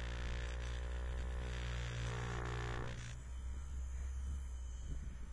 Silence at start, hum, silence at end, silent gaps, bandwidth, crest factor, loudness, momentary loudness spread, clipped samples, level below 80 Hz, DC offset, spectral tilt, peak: 0 s; none; 0 s; none; 10.5 kHz; 12 dB; -45 LUFS; 6 LU; under 0.1%; -44 dBFS; under 0.1%; -5 dB/octave; -30 dBFS